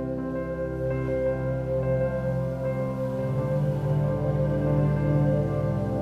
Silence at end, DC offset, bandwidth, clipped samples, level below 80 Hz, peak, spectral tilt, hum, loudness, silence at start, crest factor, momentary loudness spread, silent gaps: 0 s; under 0.1%; 6 kHz; under 0.1%; -40 dBFS; -12 dBFS; -10 dB/octave; none; -26 LUFS; 0 s; 14 dB; 5 LU; none